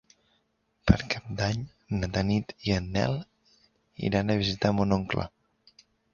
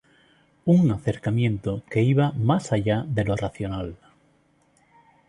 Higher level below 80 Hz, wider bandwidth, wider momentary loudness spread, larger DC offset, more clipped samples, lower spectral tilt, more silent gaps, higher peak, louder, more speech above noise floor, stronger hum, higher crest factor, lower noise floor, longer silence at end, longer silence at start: first, -42 dBFS vs -48 dBFS; second, 7.2 kHz vs 11 kHz; second, 8 LU vs 11 LU; neither; neither; second, -6.5 dB/octave vs -8 dB/octave; neither; about the same, -4 dBFS vs -6 dBFS; second, -28 LUFS vs -24 LUFS; first, 45 dB vs 40 dB; neither; first, 26 dB vs 18 dB; first, -73 dBFS vs -63 dBFS; second, 0.85 s vs 1.35 s; first, 0.85 s vs 0.65 s